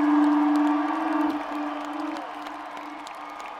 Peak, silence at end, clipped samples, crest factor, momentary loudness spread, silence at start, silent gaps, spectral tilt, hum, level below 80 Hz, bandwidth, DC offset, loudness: -12 dBFS; 0 s; under 0.1%; 14 dB; 16 LU; 0 s; none; -4 dB/octave; none; -68 dBFS; 9.2 kHz; under 0.1%; -25 LUFS